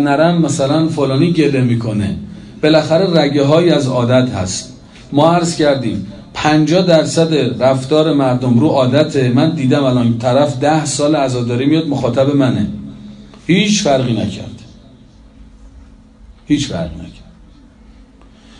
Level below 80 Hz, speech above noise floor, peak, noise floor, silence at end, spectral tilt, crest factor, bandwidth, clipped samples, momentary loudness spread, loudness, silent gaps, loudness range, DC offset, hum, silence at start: -44 dBFS; 29 dB; 0 dBFS; -42 dBFS; 1.4 s; -6 dB/octave; 14 dB; 11 kHz; under 0.1%; 11 LU; -13 LUFS; none; 9 LU; under 0.1%; none; 0 s